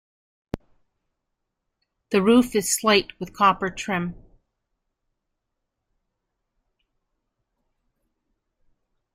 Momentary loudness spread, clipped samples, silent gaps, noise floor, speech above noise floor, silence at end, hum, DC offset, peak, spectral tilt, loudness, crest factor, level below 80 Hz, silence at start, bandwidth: 19 LU; under 0.1%; none; -80 dBFS; 59 dB; 4.95 s; none; under 0.1%; -6 dBFS; -3.5 dB/octave; -21 LUFS; 22 dB; -56 dBFS; 0.55 s; 15.5 kHz